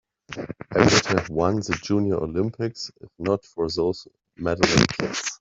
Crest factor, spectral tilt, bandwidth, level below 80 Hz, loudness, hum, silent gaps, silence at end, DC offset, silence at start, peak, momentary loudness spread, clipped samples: 24 dB; -4.5 dB/octave; 8 kHz; -48 dBFS; -23 LUFS; none; none; 0.05 s; under 0.1%; 0.3 s; 0 dBFS; 17 LU; under 0.1%